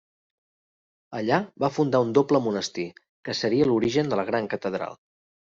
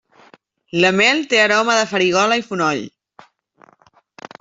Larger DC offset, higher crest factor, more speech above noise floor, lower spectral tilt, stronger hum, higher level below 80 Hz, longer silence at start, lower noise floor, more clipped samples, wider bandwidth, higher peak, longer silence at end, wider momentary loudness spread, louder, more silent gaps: neither; about the same, 20 dB vs 16 dB; first, over 66 dB vs 38 dB; first, -6 dB/octave vs -3.5 dB/octave; neither; about the same, -64 dBFS vs -64 dBFS; first, 1.1 s vs 0.75 s; first, under -90 dBFS vs -54 dBFS; neither; about the same, 7.8 kHz vs 8 kHz; second, -6 dBFS vs -2 dBFS; second, 0.55 s vs 1.5 s; first, 13 LU vs 10 LU; second, -25 LUFS vs -16 LUFS; first, 3.09-3.23 s vs none